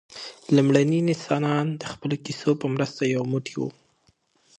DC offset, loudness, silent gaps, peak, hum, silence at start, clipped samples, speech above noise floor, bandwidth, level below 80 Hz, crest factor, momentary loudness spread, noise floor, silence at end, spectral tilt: under 0.1%; -24 LUFS; none; -4 dBFS; none; 0.15 s; under 0.1%; 42 dB; 9.6 kHz; -68 dBFS; 22 dB; 12 LU; -65 dBFS; 0.9 s; -6.5 dB/octave